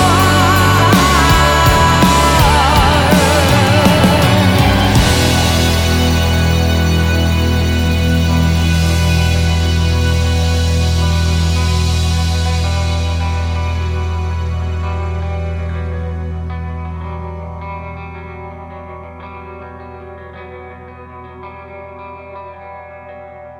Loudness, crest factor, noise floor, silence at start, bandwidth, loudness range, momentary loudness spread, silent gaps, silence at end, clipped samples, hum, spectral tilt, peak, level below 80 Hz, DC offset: -13 LUFS; 14 dB; -33 dBFS; 0 s; 18 kHz; 22 LU; 22 LU; none; 0 s; under 0.1%; none; -5 dB/octave; 0 dBFS; -24 dBFS; under 0.1%